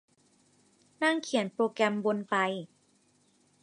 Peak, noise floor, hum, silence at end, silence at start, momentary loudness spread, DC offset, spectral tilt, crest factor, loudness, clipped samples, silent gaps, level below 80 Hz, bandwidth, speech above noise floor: -12 dBFS; -68 dBFS; 50 Hz at -60 dBFS; 1 s; 1 s; 5 LU; under 0.1%; -4.5 dB/octave; 20 dB; -30 LUFS; under 0.1%; none; -84 dBFS; 11.5 kHz; 39 dB